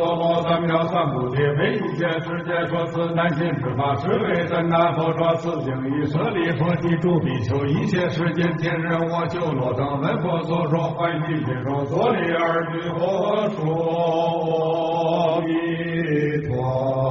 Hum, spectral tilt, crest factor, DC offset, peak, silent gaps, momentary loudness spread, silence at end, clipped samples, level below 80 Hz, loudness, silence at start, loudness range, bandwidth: none; -6 dB/octave; 14 dB; under 0.1%; -6 dBFS; none; 4 LU; 0 s; under 0.1%; -52 dBFS; -22 LUFS; 0 s; 1 LU; 7.4 kHz